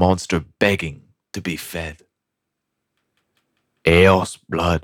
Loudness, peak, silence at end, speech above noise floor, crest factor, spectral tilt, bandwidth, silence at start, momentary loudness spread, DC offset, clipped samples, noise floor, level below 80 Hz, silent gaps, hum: -19 LUFS; -4 dBFS; 0 s; 61 dB; 18 dB; -5.5 dB/octave; 17 kHz; 0 s; 17 LU; under 0.1%; under 0.1%; -80 dBFS; -40 dBFS; none; none